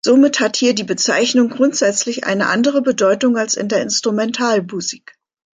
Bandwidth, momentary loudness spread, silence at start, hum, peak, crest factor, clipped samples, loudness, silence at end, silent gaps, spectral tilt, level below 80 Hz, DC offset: 9.6 kHz; 5 LU; 0.05 s; none; -2 dBFS; 14 dB; under 0.1%; -16 LUFS; 0.55 s; none; -3 dB/octave; -64 dBFS; under 0.1%